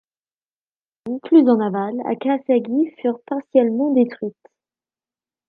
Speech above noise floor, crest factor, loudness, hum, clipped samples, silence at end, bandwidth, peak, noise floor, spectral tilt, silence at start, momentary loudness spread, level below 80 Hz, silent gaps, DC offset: over 72 dB; 18 dB; -19 LUFS; none; under 0.1%; 1.2 s; 4.8 kHz; -2 dBFS; under -90 dBFS; -10 dB/octave; 1.05 s; 15 LU; -74 dBFS; none; under 0.1%